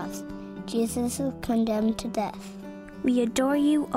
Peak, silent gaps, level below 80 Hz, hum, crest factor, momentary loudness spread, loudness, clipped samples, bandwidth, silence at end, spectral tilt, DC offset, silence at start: -12 dBFS; none; -52 dBFS; none; 14 dB; 16 LU; -27 LUFS; under 0.1%; 16 kHz; 0 s; -5 dB/octave; under 0.1%; 0 s